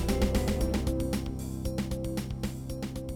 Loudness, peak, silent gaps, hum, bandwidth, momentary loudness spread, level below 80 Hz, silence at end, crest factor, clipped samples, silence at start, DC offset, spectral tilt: -32 LUFS; -16 dBFS; none; none; 18.5 kHz; 8 LU; -36 dBFS; 0 s; 14 dB; under 0.1%; 0 s; under 0.1%; -6 dB/octave